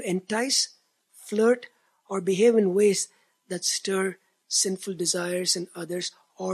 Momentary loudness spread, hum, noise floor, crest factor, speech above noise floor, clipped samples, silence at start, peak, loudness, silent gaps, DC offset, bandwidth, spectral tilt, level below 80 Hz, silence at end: 12 LU; none; -56 dBFS; 18 dB; 31 dB; under 0.1%; 0 s; -8 dBFS; -25 LUFS; none; under 0.1%; 14 kHz; -3 dB/octave; -82 dBFS; 0 s